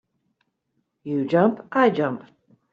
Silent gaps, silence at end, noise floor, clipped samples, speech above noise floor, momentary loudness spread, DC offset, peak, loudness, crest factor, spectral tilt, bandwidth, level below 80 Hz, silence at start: none; 0.5 s; -74 dBFS; under 0.1%; 53 dB; 14 LU; under 0.1%; -4 dBFS; -22 LUFS; 20 dB; -8.5 dB/octave; 7.4 kHz; -70 dBFS; 1.05 s